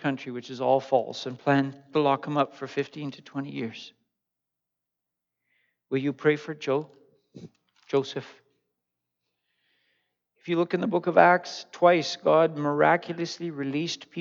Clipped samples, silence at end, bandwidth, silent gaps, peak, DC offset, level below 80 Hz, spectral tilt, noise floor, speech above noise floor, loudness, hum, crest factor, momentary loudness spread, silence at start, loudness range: under 0.1%; 0 s; 7.6 kHz; none; -2 dBFS; under 0.1%; -84 dBFS; -6 dB/octave; -86 dBFS; 60 dB; -26 LUFS; 60 Hz at -70 dBFS; 24 dB; 14 LU; 0.05 s; 14 LU